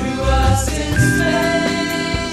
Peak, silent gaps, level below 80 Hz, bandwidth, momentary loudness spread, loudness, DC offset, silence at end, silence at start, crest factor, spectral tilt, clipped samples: -2 dBFS; none; -24 dBFS; 15 kHz; 4 LU; -17 LUFS; under 0.1%; 0 s; 0 s; 14 dB; -5 dB/octave; under 0.1%